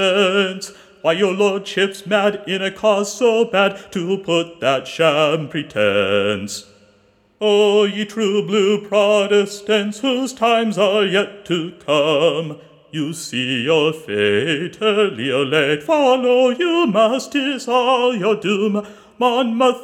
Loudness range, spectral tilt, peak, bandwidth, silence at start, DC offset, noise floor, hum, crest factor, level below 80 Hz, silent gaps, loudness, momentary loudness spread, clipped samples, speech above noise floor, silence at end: 3 LU; -4.5 dB/octave; 0 dBFS; 15 kHz; 0 s; under 0.1%; -56 dBFS; none; 18 dB; -66 dBFS; none; -17 LUFS; 8 LU; under 0.1%; 39 dB; 0 s